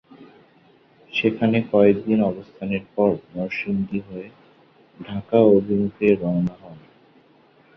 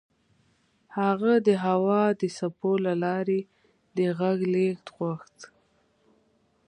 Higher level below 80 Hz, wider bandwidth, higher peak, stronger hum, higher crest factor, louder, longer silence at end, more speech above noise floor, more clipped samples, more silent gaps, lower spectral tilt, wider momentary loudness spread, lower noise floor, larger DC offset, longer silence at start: first, -56 dBFS vs -74 dBFS; second, 6 kHz vs 10 kHz; first, -2 dBFS vs -10 dBFS; neither; about the same, 20 dB vs 18 dB; first, -21 LUFS vs -26 LUFS; second, 1 s vs 1.2 s; second, 35 dB vs 42 dB; neither; neither; first, -9 dB/octave vs -7.5 dB/octave; first, 16 LU vs 11 LU; second, -55 dBFS vs -67 dBFS; neither; second, 0.2 s vs 0.9 s